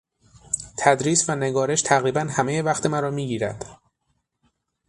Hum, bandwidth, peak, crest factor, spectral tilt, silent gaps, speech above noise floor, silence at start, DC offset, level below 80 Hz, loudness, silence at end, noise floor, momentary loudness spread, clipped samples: none; 11.5 kHz; -2 dBFS; 22 dB; -4 dB/octave; none; 51 dB; 0.5 s; under 0.1%; -58 dBFS; -22 LUFS; 1.15 s; -73 dBFS; 10 LU; under 0.1%